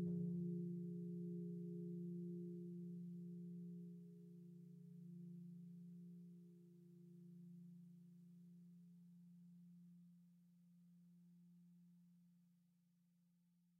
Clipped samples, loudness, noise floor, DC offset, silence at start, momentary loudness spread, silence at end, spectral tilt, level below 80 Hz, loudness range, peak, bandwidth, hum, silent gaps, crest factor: under 0.1%; -53 LUFS; -79 dBFS; under 0.1%; 0 s; 18 LU; 1.15 s; -13.5 dB/octave; under -90 dBFS; 17 LU; -38 dBFS; 0.7 kHz; none; none; 16 dB